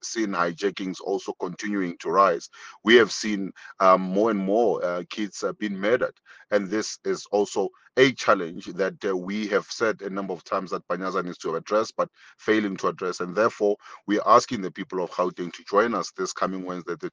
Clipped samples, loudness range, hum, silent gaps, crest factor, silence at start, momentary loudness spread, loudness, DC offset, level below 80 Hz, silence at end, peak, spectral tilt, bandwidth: under 0.1%; 5 LU; none; none; 22 dB; 0.05 s; 12 LU; -25 LUFS; under 0.1%; -70 dBFS; 0.05 s; -4 dBFS; -4.5 dB/octave; 9.8 kHz